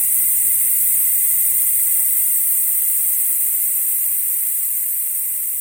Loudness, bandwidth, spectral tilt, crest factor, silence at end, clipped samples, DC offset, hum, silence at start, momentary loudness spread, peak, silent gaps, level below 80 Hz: -14 LUFS; 17 kHz; 2 dB/octave; 14 dB; 0 s; under 0.1%; under 0.1%; none; 0 s; 4 LU; -4 dBFS; none; -58 dBFS